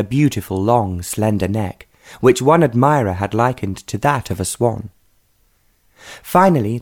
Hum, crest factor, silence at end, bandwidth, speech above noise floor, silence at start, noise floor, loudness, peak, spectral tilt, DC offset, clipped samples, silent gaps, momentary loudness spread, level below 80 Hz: none; 16 dB; 0 s; 19.5 kHz; 43 dB; 0 s; -59 dBFS; -17 LUFS; -2 dBFS; -6.5 dB/octave; under 0.1%; under 0.1%; none; 12 LU; -46 dBFS